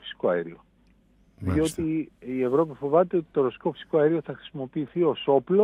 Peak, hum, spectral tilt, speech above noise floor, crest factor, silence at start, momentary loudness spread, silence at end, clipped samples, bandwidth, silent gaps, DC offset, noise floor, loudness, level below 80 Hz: -8 dBFS; none; -7 dB/octave; 36 dB; 18 dB; 0.05 s; 11 LU; 0 s; under 0.1%; 13.5 kHz; none; under 0.1%; -61 dBFS; -26 LUFS; -56 dBFS